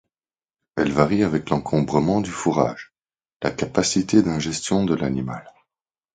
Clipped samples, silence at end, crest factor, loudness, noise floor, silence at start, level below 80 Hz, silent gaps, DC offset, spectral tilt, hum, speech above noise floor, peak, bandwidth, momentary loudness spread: under 0.1%; 0.65 s; 22 dB; -22 LUFS; under -90 dBFS; 0.75 s; -48 dBFS; 3.36-3.40 s; under 0.1%; -5.5 dB/octave; none; over 69 dB; 0 dBFS; 9.6 kHz; 9 LU